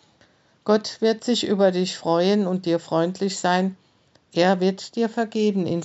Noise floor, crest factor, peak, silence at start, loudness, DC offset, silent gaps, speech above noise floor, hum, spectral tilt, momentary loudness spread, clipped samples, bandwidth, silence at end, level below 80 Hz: -59 dBFS; 16 dB; -6 dBFS; 0.65 s; -22 LUFS; under 0.1%; none; 37 dB; none; -5.5 dB/octave; 5 LU; under 0.1%; 8.2 kHz; 0 s; -74 dBFS